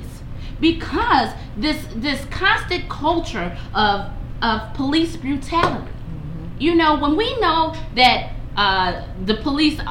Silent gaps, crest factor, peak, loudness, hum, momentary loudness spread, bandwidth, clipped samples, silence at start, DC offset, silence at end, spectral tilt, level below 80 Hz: none; 18 dB; -2 dBFS; -19 LUFS; none; 13 LU; 16.5 kHz; under 0.1%; 0 s; under 0.1%; 0 s; -5 dB/octave; -32 dBFS